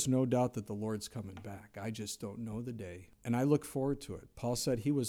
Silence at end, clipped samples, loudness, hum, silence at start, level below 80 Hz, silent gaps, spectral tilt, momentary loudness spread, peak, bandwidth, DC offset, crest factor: 0 s; under 0.1%; -36 LUFS; none; 0 s; -62 dBFS; none; -6 dB/octave; 15 LU; -16 dBFS; 17.5 kHz; under 0.1%; 18 dB